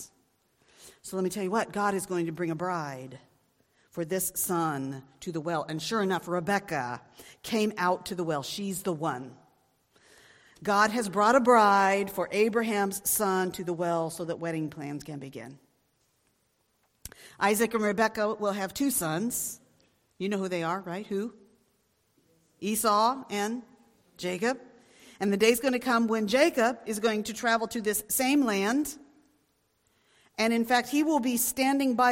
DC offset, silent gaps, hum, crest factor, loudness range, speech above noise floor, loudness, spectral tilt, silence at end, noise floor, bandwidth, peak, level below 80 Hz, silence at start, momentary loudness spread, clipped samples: under 0.1%; none; none; 22 dB; 8 LU; 45 dB; -28 LUFS; -4 dB/octave; 0 s; -73 dBFS; 16.5 kHz; -8 dBFS; -66 dBFS; 0 s; 15 LU; under 0.1%